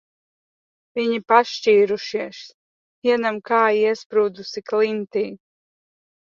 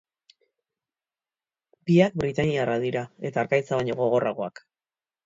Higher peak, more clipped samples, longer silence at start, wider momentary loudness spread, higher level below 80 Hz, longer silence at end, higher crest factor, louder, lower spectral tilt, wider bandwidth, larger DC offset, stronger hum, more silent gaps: first, -2 dBFS vs -6 dBFS; neither; second, 0.95 s vs 1.85 s; about the same, 13 LU vs 11 LU; second, -70 dBFS vs -58 dBFS; first, 1.05 s vs 0.75 s; about the same, 20 dB vs 20 dB; first, -20 LUFS vs -25 LUFS; second, -4.5 dB/octave vs -7 dB/octave; about the same, 7.2 kHz vs 7.8 kHz; neither; neither; first, 2.54-3.02 s, 4.06-4.10 s vs none